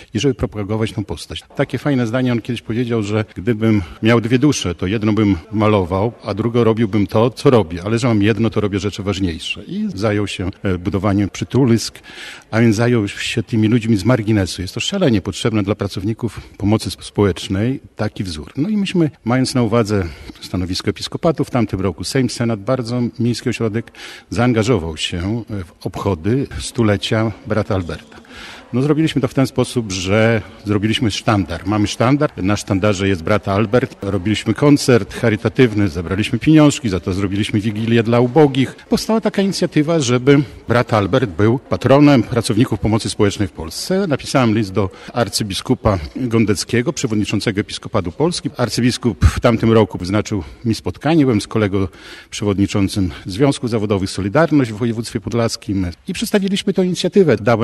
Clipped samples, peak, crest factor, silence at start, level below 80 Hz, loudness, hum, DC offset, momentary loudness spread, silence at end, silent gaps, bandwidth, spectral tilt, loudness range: under 0.1%; 0 dBFS; 16 dB; 0 s; -38 dBFS; -17 LUFS; none; under 0.1%; 9 LU; 0 s; none; 12.5 kHz; -6 dB/octave; 4 LU